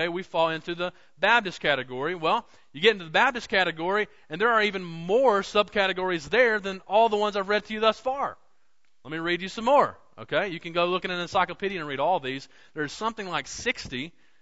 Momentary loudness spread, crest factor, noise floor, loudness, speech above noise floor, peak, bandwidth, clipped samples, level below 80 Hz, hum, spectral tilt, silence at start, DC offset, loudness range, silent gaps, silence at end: 11 LU; 20 dB; -73 dBFS; -25 LUFS; 48 dB; -6 dBFS; 8 kHz; under 0.1%; -60 dBFS; none; -4 dB/octave; 0 s; 0.2%; 5 LU; none; 0.3 s